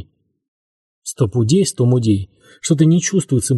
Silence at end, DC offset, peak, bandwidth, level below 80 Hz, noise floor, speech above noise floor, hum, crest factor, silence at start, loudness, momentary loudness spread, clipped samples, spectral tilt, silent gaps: 0 s; under 0.1%; -2 dBFS; 12 kHz; -50 dBFS; under -90 dBFS; over 75 dB; none; 16 dB; 0 s; -16 LUFS; 16 LU; under 0.1%; -6 dB/octave; 0.48-1.02 s